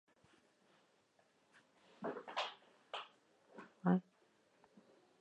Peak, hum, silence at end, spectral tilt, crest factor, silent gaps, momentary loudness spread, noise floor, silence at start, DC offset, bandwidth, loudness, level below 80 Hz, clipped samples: -22 dBFS; none; 1.2 s; -7 dB/octave; 26 dB; none; 23 LU; -75 dBFS; 2 s; under 0.1%; 8.6 kHz; -43 LUFS; under -90 dBFS; under 0.1%